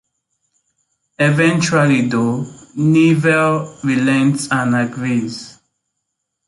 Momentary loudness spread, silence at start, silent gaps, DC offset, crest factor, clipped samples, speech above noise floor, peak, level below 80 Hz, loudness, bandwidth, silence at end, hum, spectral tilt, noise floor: 8 LU; 1.2 s; none; under 0.1%; 14 dB; under 0.1%; 61 dB; -2 dBFS; -58 dBFS; -15 LUFS; 11.5 kHz; 0.95 s; none; -6 dB/octave; -75 dBFS